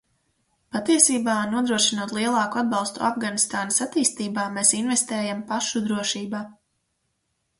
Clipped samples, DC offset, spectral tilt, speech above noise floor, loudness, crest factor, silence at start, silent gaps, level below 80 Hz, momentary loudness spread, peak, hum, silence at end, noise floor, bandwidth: under 0.1%; under 0.1%; -2 dB/octave; 51 dB; -22 LUFS; 22 dB; 0.75 s; none; -68 dBFS; 10 LU; -2 dBFS; none; 1.05 s; -74 dBFS; 11.5 kHz